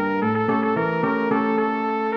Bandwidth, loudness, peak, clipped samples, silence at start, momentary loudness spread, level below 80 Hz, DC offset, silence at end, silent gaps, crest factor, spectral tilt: 6 kHz; -22 LUFS; -8 dBFS; under 0.1%; 0 s; 1 LU; -64 dBFS; under 0.1%; 0 s; none; 14 dB; -9 dB/octave